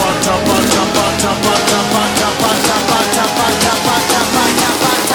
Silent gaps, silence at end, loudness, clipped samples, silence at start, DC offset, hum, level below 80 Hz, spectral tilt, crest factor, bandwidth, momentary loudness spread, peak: none; 0 s; -12 LUFS; under 0.1%; 0 s; under 0.1%; none; -38 dBFS; -2.5 dB/octave; 12 dB; over 20 kHz; 2 LU; 0 dBFS